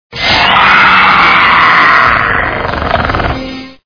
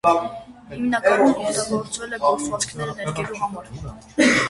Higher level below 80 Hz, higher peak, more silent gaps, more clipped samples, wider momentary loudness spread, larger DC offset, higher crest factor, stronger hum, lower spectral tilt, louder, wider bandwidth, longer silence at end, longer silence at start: first, -28 dBFS vs -50 dBFS; first, 0 dBFS vs -4 dBFS; neither; first, 2% vs under 0.1%; second, 10 LU vs 17 LU; neither; second, 8 dB vs 18 dB; neither; about the same, -4.5 dB/octave vs -4 dB/octave; first, -6 LUFS vs -22 LUFS; second, 5.4 kHz vs 11.5 kHz; first, 0.15 s vs 0 s; about the same, 0.1 s vs 0.05 s